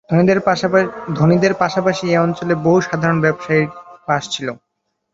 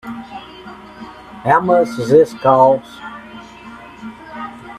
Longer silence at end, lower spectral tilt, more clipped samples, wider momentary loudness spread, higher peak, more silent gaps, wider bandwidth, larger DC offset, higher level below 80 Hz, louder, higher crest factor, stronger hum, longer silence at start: first, 0.6 s vs 0 s; about the same, -6.5 dB/octave vs -6.5 dB/octave; neither; second, 9 LU vs 24 LU; about the same, 0 dBFS vs 0 dBFS; neither; second, 7.8 kHz vs 13.5 kHz; neither; about the same, -54 dBFS vs -54 dBFS; second, -16 LUFS vs -13 LUFS; about the same, 16 dB vs 18 dB; neither; about the same, 0.1 s vs 0.05 s